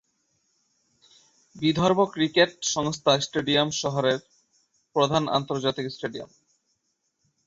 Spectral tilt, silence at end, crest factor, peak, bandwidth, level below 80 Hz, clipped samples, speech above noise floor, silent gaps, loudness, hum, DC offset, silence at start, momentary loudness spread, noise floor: -4 dB/octave; 1.2 s; 22 dB; -6 dBFS; 8 kHz; -60 dBFS; under 0.1%; 51 dB; none; -24 LUFS; none; under 0.1%; 1.55 s; 10 LU; -75 dBFS